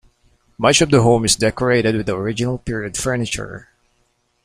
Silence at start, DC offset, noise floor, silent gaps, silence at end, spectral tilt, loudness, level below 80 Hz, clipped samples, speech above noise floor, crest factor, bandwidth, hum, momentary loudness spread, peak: 0.6 s; under 0.1%; -64 dBFS; none; 0.85 s; -4 dB/octave; -17 LUFS; -42 dBFS; under 0.1%; 47 dB; 18 dB; 15.5 kHz; none; 11 LU; 0 dBFS